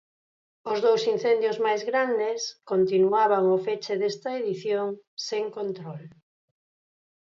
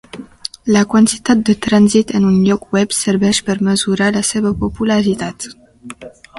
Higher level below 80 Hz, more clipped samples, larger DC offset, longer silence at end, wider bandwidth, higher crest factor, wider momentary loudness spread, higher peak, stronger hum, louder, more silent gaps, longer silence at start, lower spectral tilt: second, -78 dBFS vs -42 dBFS; neither; neither; first, 1.3 s vs 0 s; second, 7.6 kHz vs 11.5 kHz; about the same, 16 dB vs 14 dB; second, 12 LU vs 17 LU; second, -10 dBFS vs 0 dBFS; neither; second, -25 LUFS vs -14 LUFS; first, 5.07-5.17 s vs none; first, 0.65 s vs 0.15 s; about the same, -5 dB/octave vs -5 dB/octave